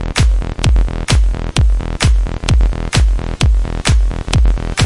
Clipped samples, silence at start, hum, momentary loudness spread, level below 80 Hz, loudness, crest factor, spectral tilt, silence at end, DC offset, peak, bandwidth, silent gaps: under 0.1%; 0 s; none; 2 LU; -14 dBFS; -15 LUFS; 12 dB; -4.5 dB/octave; 0 s; under 0.1%; 0 dBFS; 11.5 kHz; none